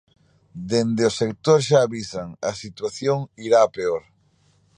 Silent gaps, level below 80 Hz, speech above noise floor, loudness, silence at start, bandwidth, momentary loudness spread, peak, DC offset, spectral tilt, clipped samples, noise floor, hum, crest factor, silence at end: none; -58 dBFS; 40 dB; -22 LUFS; 0.55 s; 10 kHz; 13 LU; -4 dBFS; under 0.1%; -5.5 dB/octave; under 0.1%; -61 dBFS; none; 18 dB; 0.8 s